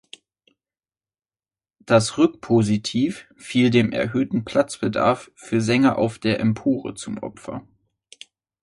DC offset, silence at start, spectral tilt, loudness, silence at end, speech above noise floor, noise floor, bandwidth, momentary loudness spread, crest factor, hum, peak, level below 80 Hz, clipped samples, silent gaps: under 0.1%; 1.9 s; -6 dB/octave; -21 LUFS; 1 s; over 69 dB; under -90 dBFS; 11.5 kHz; 14 LU; 20 dB; none; -2 dBFS; -56 dBFS; under 0.1%; none